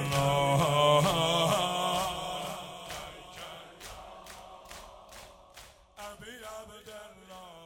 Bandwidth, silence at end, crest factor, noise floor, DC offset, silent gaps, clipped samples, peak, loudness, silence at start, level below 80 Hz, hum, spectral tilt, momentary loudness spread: 17 kHz; 0 s; 18 dB; -54 dBFS; under 0.1%; none; under 0.1%; -14 dBFS; -28 LUFS; 0 s; -56 dBFS; none; -4 dB/octave; 24 LU